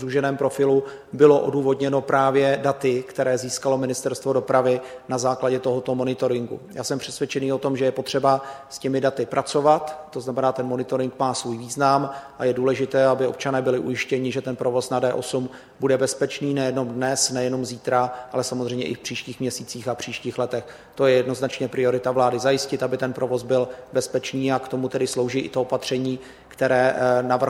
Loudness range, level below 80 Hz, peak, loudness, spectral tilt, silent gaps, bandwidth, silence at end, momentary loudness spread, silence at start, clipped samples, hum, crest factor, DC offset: 4 LU; -62 dBFS; -2 dBFS; -23 LUFS; -5 dB/octave; none; 15.5 kHz; 0 s; 9 LU; 0 s; under 0.1%; none; 20 dB; under 0.1%